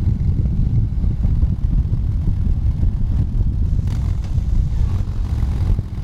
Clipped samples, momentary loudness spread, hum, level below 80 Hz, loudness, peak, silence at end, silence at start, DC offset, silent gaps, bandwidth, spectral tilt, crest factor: under 0.1%; 2 LU; none; -20 dBFS; -21 LUFS; -6 dBFS; 0 s; 0 s; under 0.1%; none; 6.8 kHz; -9.5 dB/octave; 12 dB